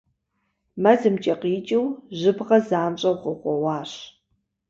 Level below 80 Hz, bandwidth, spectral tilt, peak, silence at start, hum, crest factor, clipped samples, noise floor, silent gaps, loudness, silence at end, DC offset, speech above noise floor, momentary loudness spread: -66 dBFS; 7.6 kHz; -6.5 dB/octave; -4 dBFS; 0.75 s; none; 20 dB; under 0.1%; -74 dBFS; none; -22 LUFS; 0.6 s; under 0.1%; 53 dB; 11 LU